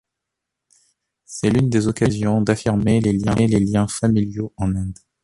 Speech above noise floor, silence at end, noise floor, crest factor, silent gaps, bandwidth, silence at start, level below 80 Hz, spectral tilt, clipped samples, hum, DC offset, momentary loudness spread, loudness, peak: 63 dB; 0.3 s; -82 dBFS; 16 dB; none; 11.5 kHz; 1.3 s; -40 dBFS; -7 dB/octave; under 0.1%; none; under 0.1%; 7 LU; -19 LUFS; -2 dBFS